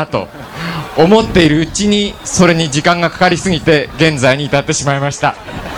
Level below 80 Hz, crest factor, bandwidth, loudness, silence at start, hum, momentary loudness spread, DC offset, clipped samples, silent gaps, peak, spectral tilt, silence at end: -34 dBFS; 12 dB; 18 kHz; -12 LUFS; 0 s; none; 11 LU; under 0.1%; 0.2%; none; 0 dBFS; -4.5 dB/octave; 0 s